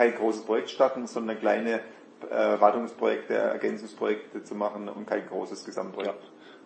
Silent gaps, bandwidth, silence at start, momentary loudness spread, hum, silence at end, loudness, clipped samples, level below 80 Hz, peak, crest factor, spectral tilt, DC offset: none; 8.8 kHz; 0 s; 12 LU; none; 0.1 s; -28 LUFS; under 0.1%; -86 dBFS; -4 dBFS; 24 dB; -5 dB/octave; under 0.1%